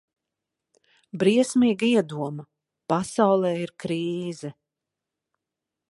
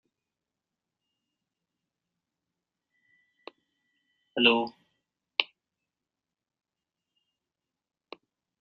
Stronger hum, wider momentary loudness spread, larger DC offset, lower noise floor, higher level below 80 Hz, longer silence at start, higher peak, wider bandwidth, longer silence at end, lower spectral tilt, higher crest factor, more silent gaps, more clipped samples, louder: neither; about the same, 18 LU vs 16 LU; neither; second, -86 dBFS vs -90 dBFS; first, -68 dBFS vs -80 dBFS; second, 1.15 s vs 4.35 s; about the same, -6 dBFS vs -4 dBFS; first, 11.5 kHz vs 6.2 kHz; second, 1.35 s vs 3.15 s; first, -5.5 dB/octave vs 0 dB/octave; second, 20 dB vs 32 dB; neither; neither; about the same, -24 LUFS vs -26 LUFS